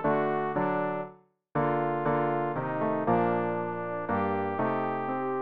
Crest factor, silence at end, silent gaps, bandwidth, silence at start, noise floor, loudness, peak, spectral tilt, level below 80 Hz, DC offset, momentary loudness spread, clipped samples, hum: 14 dB; 0 s; none; 5 kHz; 0 s; -51 dBFS; -29 LUFS; -14 dBFS; -6.5 dB/octave; -64 dBFS; 0.3%; 7 LU; under 0.1%; none